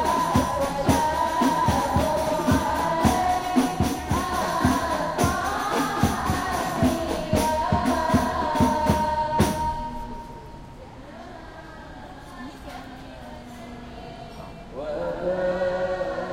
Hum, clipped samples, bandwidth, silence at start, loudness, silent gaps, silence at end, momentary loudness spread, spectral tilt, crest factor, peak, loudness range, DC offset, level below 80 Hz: none; under 0.1%; 16 kHz; 0 s; -24 LUFS; none; 0 s; 19 LU; -5.5 dB/octave; 20 dB; -6 dBFS; 17 LU; under 0.1%; -38 dBFS